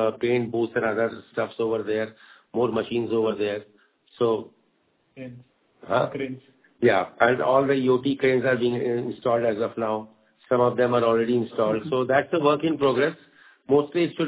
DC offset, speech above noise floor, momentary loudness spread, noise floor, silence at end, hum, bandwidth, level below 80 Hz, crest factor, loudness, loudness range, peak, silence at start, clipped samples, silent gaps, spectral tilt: under 0.1%; 44 dB; 9 LU; -67 dBFS; 0 s; none; 4 kHz; -64 dBFS; 20 dB; -24 LUFS; 6 LU; -4 dBFS; 0 s; under 0.1%; none; -10.5 dB/octave